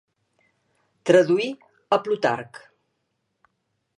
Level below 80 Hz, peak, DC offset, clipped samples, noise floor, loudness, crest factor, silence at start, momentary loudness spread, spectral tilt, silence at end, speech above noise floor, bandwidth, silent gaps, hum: -76 dBFS; -4 dBFS; under 0.1%; under 0.1%; -75 dBFS; -22 LUFS; 20 dB; 1.05 s; 17 LU; -5.5 dB/octave; 1.4 s; 55 dB; 10.5 kHz; none; none